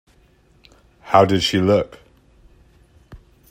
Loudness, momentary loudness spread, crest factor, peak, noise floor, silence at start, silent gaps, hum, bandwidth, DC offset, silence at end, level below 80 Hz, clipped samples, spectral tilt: -17 LUFS; 5 LU; 22 dB; 0 dBFS; -55 dBFS; 1.05 s; none; none; 16 kHz; under 0.1%; 0.35 s; -52 dBFS; under 0.1%; -5.5 dB/octave